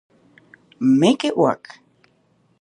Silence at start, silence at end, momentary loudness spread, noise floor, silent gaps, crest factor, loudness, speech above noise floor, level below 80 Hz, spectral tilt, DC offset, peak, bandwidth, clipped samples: 0.8 s; 1.05 s; 7 LU; -61 dBFS; none; 20 dB; -18 LUFS; 44 dB; -70 dBFS; -6 dB/octave; under 0.1%; -2 dBFS; 11 kHz; under 0.1%